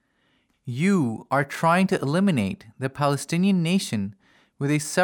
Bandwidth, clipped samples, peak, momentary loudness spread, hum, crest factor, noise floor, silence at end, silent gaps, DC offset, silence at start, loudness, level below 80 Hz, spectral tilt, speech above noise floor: 18.5 kHz; under 0.1%; -8 dBFS; 11 LU; none; 16 dB; -67 dBFS; 0 s; none; under 0.1%; 0.65 s; -23 LUFS; -66 dBFS; -6 dB/octave; 45 dB